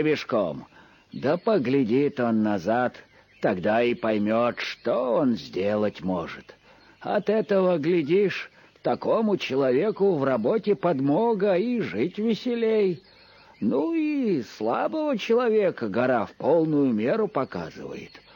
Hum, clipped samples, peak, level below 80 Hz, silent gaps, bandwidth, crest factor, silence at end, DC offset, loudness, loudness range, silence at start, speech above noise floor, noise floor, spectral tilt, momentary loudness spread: none; under 0.1%; -10 dBFS; -66 dBFS; none; 17 kHz; 14 dB; 0.15 s; under 0.1%; -24 LUFS; 2 LU; 0 s; 27 dB; -51 dBFS; -7.5 dB/octave; 8 LU